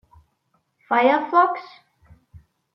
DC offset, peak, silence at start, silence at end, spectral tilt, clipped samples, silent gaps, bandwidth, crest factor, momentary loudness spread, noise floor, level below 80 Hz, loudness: under 0.1%; -4 dBFS; 0.9 s; 0.35 s; -6.5 dB/octave; under 0.1%; none; 6 kHz; 20 dB; 7 LU; -69 dBFS; -62 dBFS; -19 LUFS